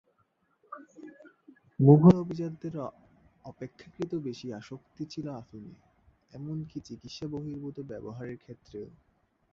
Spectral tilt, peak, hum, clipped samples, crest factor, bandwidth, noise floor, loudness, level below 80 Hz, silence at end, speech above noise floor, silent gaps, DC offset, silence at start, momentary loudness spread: -9.5 dB/octave; -6 dBFS; none; under 0.1%; 24 dB; 7.2 kHz; -73 dBFS; -28 LUFS; -62 dBFS; 0.7 s; 44 dB; none; under 0.1%; 0.7 s; 27 LU